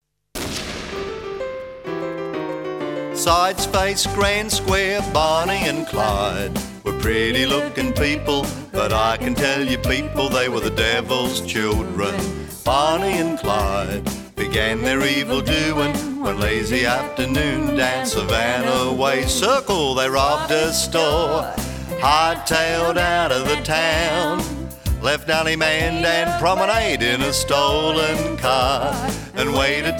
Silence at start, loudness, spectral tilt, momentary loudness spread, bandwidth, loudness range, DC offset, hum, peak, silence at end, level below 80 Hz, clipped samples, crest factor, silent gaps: 0.35 s; -20 LUFS; -3.5 dB/octave; 9 LU; 19 kHz; 3 LU; under 0.1%; none; -2 dBFS; 0 s; -34 dBFS; under 0.1%; 18 dB; none